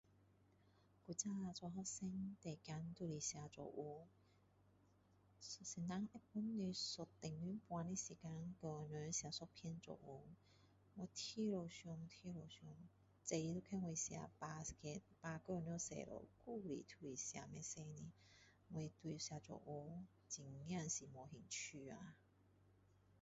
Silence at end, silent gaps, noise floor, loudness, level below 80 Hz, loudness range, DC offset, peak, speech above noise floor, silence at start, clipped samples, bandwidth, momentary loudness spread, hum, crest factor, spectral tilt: 0.1 s; none; -75 dBFS; -50 LUFS; -76 dBFS; 4 LU; under 0.1%; -28 dBFS; 25 dB; 0.1 s; under 0.1%; 7.6 kHz; 13 LU; none; 22 dB; -5.5 dB/octave